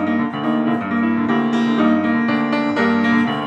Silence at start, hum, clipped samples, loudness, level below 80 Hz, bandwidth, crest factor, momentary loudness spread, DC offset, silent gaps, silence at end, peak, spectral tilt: 0 s; none; under 0.1%; -18 LUFS; -64 dBFS; 7.4 kHz; 14 dB; 4 LU; under 0.1%; none; 0 s; -4 dBFS; -7 dB/octave